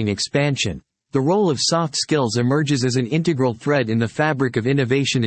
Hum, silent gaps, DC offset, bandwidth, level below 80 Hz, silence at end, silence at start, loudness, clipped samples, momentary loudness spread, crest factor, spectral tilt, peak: none; none; under 0.1%; 8.8 kHz; -56 dBFS; 0 s; 0 s; -20 LUFS; under 0.1%; 4 LU; 14 dB; -5 dB/octave; -4 dBFS